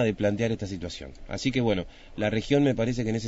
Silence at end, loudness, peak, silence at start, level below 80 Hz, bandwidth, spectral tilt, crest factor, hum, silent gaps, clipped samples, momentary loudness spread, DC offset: 0 s; -27 LUFS; -10 dBFS; 0 s; -46 dBFS; 8 kHz; -6 dB/octave; 18 dB; none; none; under 0.1%; 14 LU; under 0.1%